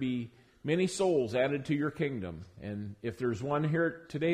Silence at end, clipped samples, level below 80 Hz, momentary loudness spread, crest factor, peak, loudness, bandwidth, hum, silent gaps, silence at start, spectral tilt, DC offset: 0 s; under 0.1%; -64 dBFS; 13 LU; 14 dB; -18 dBFS; -32 LUFS; 13.5 kHz; none; none; 0 s; -6.5 dB/octave; under 0.1%